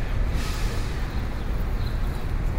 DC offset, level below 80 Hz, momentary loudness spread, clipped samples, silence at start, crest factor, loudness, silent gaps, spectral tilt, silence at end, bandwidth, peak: under 0.1%; -26 dBFS; 2 LU; under 0.1%; 0 s; 12 dB; -30 LUFS; none; -6 dB/octave; 0 s; 16 kHz; -14 dBFS